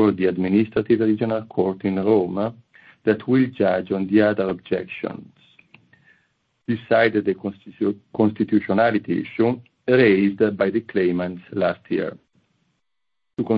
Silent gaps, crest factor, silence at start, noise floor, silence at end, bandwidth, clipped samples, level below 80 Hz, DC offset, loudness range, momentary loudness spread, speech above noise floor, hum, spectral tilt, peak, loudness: none; 18 dB; 0 s; -83 dBFS; 0 s; 5.2 kHz; under 0.1%; -62 dBFS; under 0.1%; 5 LU; 11 LU; 63 dB; none; -10 dB/octave; -2 dBFS; -21 LUFS